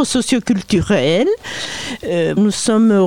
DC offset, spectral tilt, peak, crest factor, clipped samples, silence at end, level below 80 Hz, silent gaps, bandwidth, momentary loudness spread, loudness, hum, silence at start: 0.8%; -5 dB/octave; -4 dBFS; 12 dB; under 0.1%; 0 s; -42 dBFS; none; 15.5 kHz; 9 LU; -16 LUFS; none; 0 s